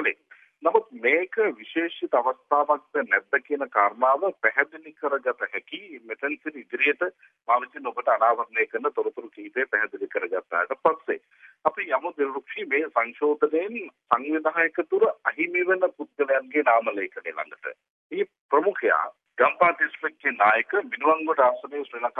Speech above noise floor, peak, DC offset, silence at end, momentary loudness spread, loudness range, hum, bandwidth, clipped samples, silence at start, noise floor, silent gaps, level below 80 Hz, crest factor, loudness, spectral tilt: 30 dB; -4 dBFS; under 0.1%; 0 s; 12 LU; 4 LU; none; 3.9 kHz; under 0.1%; 0 s; -55 dBFS; 17.90-18.10 s, 18.40-18.49 s; -86 dBFS; 22 dB; -25 LUFS; -6.5 dB/octave